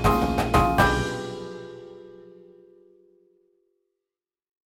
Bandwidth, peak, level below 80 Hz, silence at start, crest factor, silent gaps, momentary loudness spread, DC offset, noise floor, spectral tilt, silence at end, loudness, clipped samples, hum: 17.5 kHz; -4 dBFS; -38 dBFS; 0 s; 22 dB; none; 24 LU; under 0.1%; -88 dBFS; -5.5 dB/octave; 2.45 s; -23 LUFS; under 0.1%; none